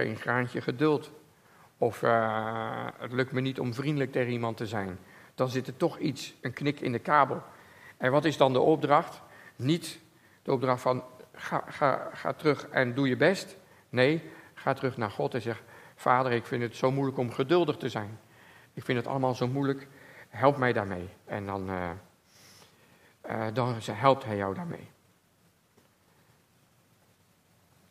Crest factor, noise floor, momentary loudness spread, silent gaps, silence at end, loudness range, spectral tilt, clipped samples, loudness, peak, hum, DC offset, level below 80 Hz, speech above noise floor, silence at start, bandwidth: 24 dB; -66 dBFS; 15 LU; none; 3.05 s; 5 LU; -6.5 dB/octave; under 0.1%; -29 LUFS; -6 dBFS; none; under 0.1%; -74 dBFS; 37 dB; 0 s; 15.5 kHz